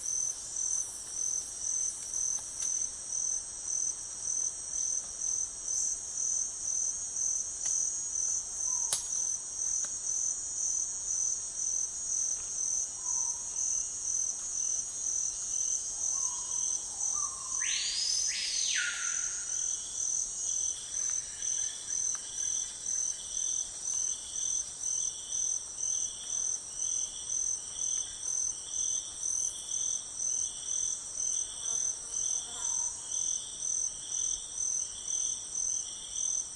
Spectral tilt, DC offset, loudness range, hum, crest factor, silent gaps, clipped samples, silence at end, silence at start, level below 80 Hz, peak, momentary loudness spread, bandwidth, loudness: 2.5 dB/octave; under 0.1%; 2 LU; none; 22 dB; none; under 0.1%; 0 s; 0 s; -64 dBFS; -12 dBFS; 3 LU; 11.5 kHz; -31 LUFS